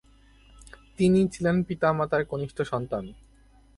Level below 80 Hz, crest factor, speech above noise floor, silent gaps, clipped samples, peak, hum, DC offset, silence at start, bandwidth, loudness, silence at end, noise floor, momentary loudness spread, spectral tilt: -52 dBFS; 18 dB; 32 dB; none; under 0.1%; -10 dBFS; none; under 0.1%; 0.6 s; 11.5 kHz; -26 LUFS; 0.65 s; -57 dBFS; 11 LU; -7 dB/octave